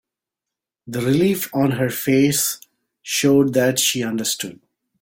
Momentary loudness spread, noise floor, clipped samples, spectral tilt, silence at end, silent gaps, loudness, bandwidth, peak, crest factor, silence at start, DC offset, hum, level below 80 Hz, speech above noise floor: 12 LU; -86 dBFS; under 0.1%; -4 dB/octave; 0.45 s; none; -19 LUFS; 17 kHz; -4 dBFS; 16 dB; 0.85 s; under 0.1%; none; -58 dBFS; 67 dB